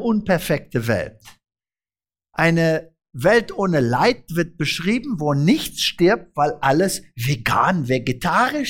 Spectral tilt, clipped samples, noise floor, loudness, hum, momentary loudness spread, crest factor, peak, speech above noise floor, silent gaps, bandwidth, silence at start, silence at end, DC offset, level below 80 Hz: -5.5 dB/octave; under 0.1%; under -90 dBFS; -20 LUFS; none; 7 LU; 16 dB; -4 dBFS; over 71 dB; none; 17 kHz; 0 s; 0 s; under 0.1%; -46 dBFS